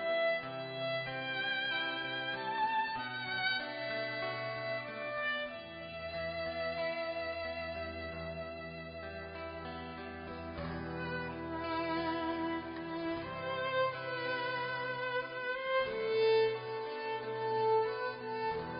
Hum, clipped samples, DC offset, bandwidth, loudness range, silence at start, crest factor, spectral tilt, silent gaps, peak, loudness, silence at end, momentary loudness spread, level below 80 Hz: none; under 0.1%; under 0.1%; 5.2 kHz; 8 LU; 0 s; 16 dB; -2 dB/octave; none; -22 dBFS; -37 LUFS; 0 s; 11 LU; -60 dBFS